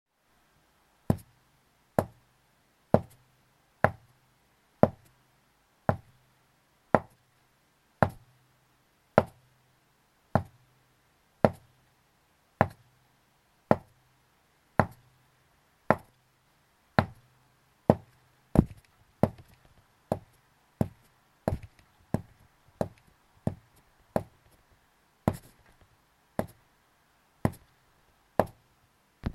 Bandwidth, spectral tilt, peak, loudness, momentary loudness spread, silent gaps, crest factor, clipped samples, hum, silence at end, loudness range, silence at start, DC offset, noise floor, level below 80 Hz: 15.5 kHz; -8 dB/octave; -2 dBFS; -31 LUFS; 13 LU; none; 32 dB; under 0.1%; none; 0.05 s; 7 LU; 1.1 s; under 0.1%; -69 dBFS; -52 dBFS